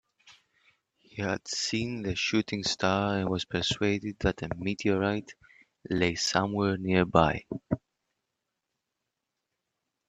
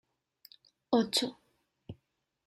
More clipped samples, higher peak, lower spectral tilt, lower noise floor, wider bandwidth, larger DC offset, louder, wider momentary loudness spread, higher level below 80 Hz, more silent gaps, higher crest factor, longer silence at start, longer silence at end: neither; first, -4 dBFS vs -14 dBFS; about the same, -4.5 dB/octave vs -3.5 dB/octave; first, -85 dBFS vs -80 dBFS; second, 9.2 kHz vs 15 kHz; neither; about the same, -29 LUFS vs -31 LUFS; second, 9 LU vs 24 LU; first, -54 dBFS vs -74 dBFS; neither; about the same, 26 dB vs 24 dB; second, 0.25 s vs 0.9 s; first, 2.3 s vs 0.55 s